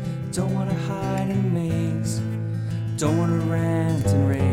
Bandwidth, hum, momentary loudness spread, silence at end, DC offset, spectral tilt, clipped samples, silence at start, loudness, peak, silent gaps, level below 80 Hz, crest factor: 15 kHz; none; 7 LU; 0 s; under 0.1%; -7 dB/octave; under 0.1%; 0 s; -24 LUFS; -8 dBFS; none; -46 dBFS; 14 dB